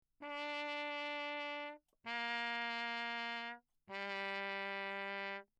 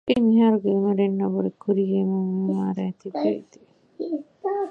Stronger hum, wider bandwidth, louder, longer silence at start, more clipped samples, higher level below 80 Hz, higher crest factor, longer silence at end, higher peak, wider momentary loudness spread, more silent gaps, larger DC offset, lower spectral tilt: neither; first, 11 kHz vs 6 kHz; second, -42 LUFS vs -23 LUFS; first, 0.2 s vs 0.05 s; neither; second, -88 dBFS vs -64 dBFS; about the same, 16 dB vs 16 dB; first, 0.15 s vs 0 s; second, -28 dBFS vs -8 dBFS; second, 9 LU vs 12 LU; neither; neither; second, -3 dB/octave vs -9.5 dB/octave